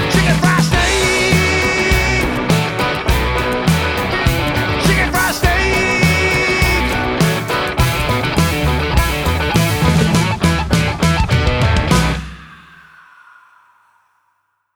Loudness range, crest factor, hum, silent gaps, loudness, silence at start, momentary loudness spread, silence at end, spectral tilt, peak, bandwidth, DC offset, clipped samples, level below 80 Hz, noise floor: 3 LU; 14 dB; none; none; -14 LUFS; 0 s; 4 LU; 2.2 s; -4.5 dB/octave; 0 dBFS; over 20 kHz; under 0.1%; under 0.1%; -24 dBFS; -65 dBFS